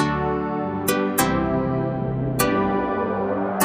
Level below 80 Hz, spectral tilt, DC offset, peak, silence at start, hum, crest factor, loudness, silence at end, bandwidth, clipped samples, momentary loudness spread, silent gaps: -42 dBFS; -5.5 dB/octave; under 0.1%; -4 dBFS; 0 s; none; 18 dB; -22 LUFS; 0 s; 16 kHz; under 0.1%; 4 LU; none